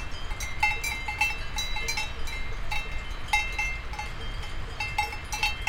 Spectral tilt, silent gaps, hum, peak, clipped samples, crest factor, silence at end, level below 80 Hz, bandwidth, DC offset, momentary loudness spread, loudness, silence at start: -2 dB/octave; none; none; -10 dBFS; under 0.1%; 20 dB; 0 s; -36 dBFS; 17 kHz; under 0.1%; 11 LU; -30 LUFS; 0 s